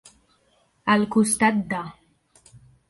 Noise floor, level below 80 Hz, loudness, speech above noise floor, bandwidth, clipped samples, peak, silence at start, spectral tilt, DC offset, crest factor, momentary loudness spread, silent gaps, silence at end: -64 dBFS; -60 dBFS; -22 LUFS; 43 dB; 11.5 kHz; under 0.1%; -6 dBFS; 0.85 s; -4 dB/octave; under 0.1%; 20 dB; 12 LU; none; 0.35 s